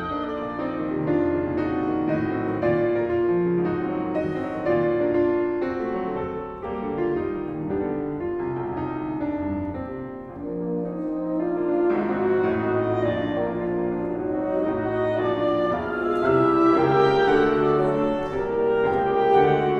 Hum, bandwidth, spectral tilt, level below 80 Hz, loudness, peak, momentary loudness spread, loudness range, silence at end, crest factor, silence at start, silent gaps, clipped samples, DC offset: none; 6.4 kHz; -8.5 dB/octave; -48 dBFS; -24 LUFS; -6 dBFS; 10 LU; 7 LU; 0 s; 16 dB; 0 s; none; under 0.1%; under 0.1%